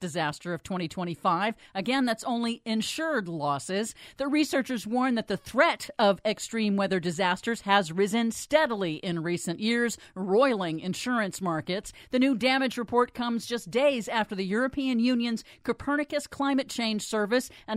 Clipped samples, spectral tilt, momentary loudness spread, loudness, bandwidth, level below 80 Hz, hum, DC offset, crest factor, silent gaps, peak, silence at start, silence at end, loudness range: under 0.1%; -4.5 dB/octave; 7 LU; -28 LUFS; 15.5 kHz; -62 dBFS; none; under 0.1%; 20 dB; none; -8 dBFS; 0 s; 0 s; 3 LU